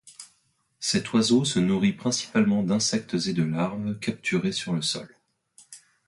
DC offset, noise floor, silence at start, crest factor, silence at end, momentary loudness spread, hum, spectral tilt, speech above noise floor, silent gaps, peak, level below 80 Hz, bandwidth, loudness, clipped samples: under 0.1%; -69 dBFS; 0.05 s; 16 dB; 0.3 s; 8 LU; none; -4.5 dB/octave; 44 dB; none; -10 dBFS; -60 dBFS; 11.5 kHz; -25 LUFS; under 0.1%